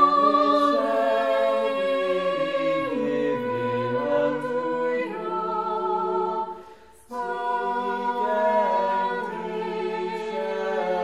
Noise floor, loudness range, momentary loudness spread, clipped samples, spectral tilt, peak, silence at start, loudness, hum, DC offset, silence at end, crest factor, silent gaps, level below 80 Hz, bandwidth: -48 dBFS; 4 LU; 8 LU; under 0.1%; -6 dB/octave; -6 dBFS; 0 s; -24 LUFS; none; 0.2%; 0 s; 18 dB; none; -66 dBFS; 12 kHz